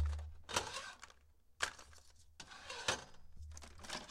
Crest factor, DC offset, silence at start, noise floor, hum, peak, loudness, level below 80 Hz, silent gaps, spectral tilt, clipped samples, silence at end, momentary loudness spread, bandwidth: 26 dB; under 0.1%; 0 s; -66 dBFS; none; -20 dBFS; -44 LUFS; -54 dBFS; none; -2.5 dB/octave; under 0.1%; 0 s; 20 LU; 16 kHz